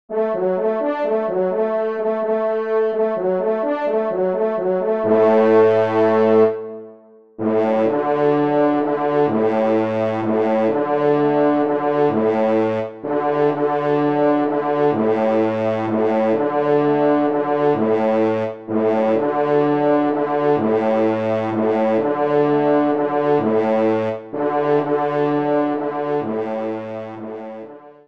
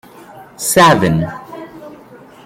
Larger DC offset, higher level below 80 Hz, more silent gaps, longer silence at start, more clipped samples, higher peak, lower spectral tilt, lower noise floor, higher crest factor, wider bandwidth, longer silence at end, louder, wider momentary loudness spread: first, 0.3% vs under 0.1%; second, -66 dBFS vs -46 dBFS; neither; second, 0.1 s vs 0.35 s; neither; second, -4 dBFS vs 0 dBFS; first, -8.5 dB/octave vs -4.5 dB/octave; first, -45 dBFS vs -39 dBFS; about the same, 14 dB vs 16 dB; second, 6 kHz vs 16.5 kHz; second, 0.15 s vs 0.5 s; second, -18 LUFS vs -12 LUFS; second, 6 LU vs 23 LU